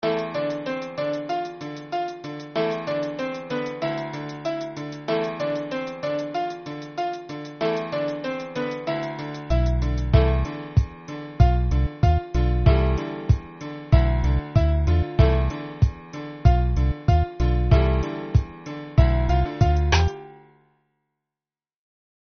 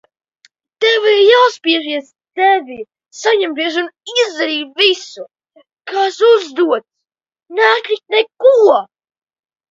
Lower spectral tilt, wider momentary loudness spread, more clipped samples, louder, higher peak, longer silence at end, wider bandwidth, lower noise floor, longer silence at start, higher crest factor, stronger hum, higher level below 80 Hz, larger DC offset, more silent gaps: first, -6.5 dB/octave vs -1 dB/octave; about the same, 12 LU vs 14 LU; neither; second, -24 LUFS vs -13 LUFS; about the same, -2 dBFS vs 0 dBFS; first, 1.9 s vs 0.85 s; second, 6.6 kHz vs 7.8 kHz; first, under -90 dBFS vs -78 dBFS; second, 0.05 s vs 0.8 s; first, 20 dB vs 14 dB; neither; first, -26 dBFS vs -70 dBFS; neither; neither